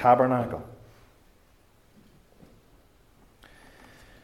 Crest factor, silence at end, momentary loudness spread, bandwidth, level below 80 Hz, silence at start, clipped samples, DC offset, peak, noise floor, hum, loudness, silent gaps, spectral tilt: 24 dB; 3.5 s; 31 LU; 13.5 kHz; -60 dBFS; 0 s; under 0.1%; under 0.1%; -6 dBFS; -61 dBFS; none; -25 LUFS; none; -8 dB/octave